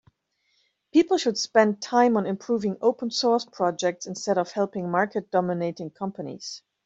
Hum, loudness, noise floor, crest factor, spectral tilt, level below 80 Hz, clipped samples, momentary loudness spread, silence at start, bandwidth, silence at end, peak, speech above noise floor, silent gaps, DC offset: none; -25 LUFS; -72 dBFS; 20 dB; -4.5 dB/octave; -70 dBFS; under 0.1%; 12 LU; 0.95 s; 8 kHz; 0.25 s; -4 dBFS; 47 dB; none; under 0.1%